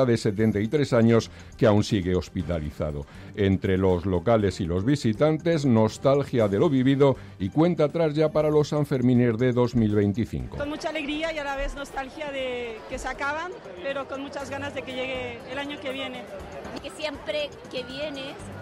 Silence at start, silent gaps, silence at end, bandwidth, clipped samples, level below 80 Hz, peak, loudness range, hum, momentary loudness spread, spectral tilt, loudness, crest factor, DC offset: 0 s; none; 0 s; 13.5 kHz; under 0.1%; -46 dBFS; -10 dBFS; 10 LU; none; 12 LU; -7 dB/octave; -25 LUFS; 14 dB; under 0.1%